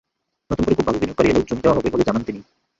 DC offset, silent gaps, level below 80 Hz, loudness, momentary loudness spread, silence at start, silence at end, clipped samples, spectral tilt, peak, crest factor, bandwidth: under 0.1%; none; -40 dBFS; -19 LUFS; 10 LU; 0.5 s; 0.4 s; under 0.1%; -7 dB/octave; -2 dBFS; 18 dB; 7.8 kHz